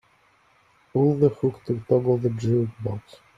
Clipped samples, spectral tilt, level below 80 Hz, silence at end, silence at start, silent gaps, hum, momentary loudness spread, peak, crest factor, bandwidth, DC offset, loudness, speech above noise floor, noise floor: under 0.1%; -10 dB/octave; -58 dBFS; 0.4 s; 0.95 s; none; none; 12 LU; -6 dBFS; 18 dB; 7.6 kHz; under 0.1%; -24 LUFS; 38 dB; -61 dBFS